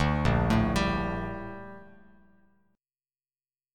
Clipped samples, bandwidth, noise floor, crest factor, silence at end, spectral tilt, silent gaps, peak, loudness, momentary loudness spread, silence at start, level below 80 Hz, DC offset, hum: under 0.1%; 14.5 kHz; under -90 dBFS; 20 dB; 1.9 s; -6.5 dB/octave; none; -12 dBFS; -28 LUFS; 20 LU; 0 s; -38 dBFS; under 0.1%; none